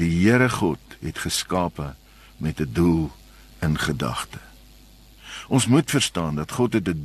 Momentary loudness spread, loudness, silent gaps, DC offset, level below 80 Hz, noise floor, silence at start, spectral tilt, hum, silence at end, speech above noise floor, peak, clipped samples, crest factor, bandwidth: 15 LU; -23 LUFS; none; under 0.1%; -42 dBFS; -49 dBFS; 0 s; -5 dB/octave; none; 0 s; 27 dB; -4 dBFS; under 0.1%; 20 dB; 13 kHz